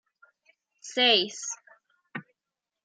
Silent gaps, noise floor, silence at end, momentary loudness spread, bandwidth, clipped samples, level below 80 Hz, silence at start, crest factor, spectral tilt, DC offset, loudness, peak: none; -88 dBFS; 0.65 s; 21 LU; 10 kHz; under 0.1%; -88 dBFS; 0.85 s; 22 dB; -1 dB/octave; under 0.1%; -24 LUFS; -8 dBFS